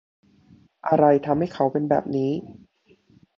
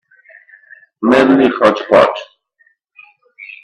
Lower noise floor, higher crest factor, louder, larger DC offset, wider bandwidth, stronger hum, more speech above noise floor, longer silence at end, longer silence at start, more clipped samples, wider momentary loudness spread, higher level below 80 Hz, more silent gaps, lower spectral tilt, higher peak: about the same, -59 dBFS vs -57 dBFS; about the same, 20 dB vs 16 dB; second, -22 LUFS vs -11 LUFS; neither; second, 7.2 kHz vs 10 kHz; neither; second, 38 dB vs 47 dB; first, 0.85 s vs 0.1 s; second, 0.85 s vs 1 s; neither; second, 10 LU vs 14 LU; second, -60 dBFS vs -54 dBFS; neither; first, -9 dB/octave vs -6 dB/octave; second, -4 dBFS vs 0 dBFS